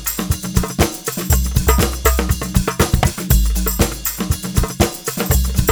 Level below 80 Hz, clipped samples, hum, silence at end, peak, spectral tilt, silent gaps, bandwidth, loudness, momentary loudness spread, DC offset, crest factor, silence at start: -20 dBFS; under 0.1%; none; 0 s; 0 dBFS; -4.5 dB/octave; none; over 20 kHz; -18 LUFS; 4 LU; under 0.1%; 16 dB; 0 s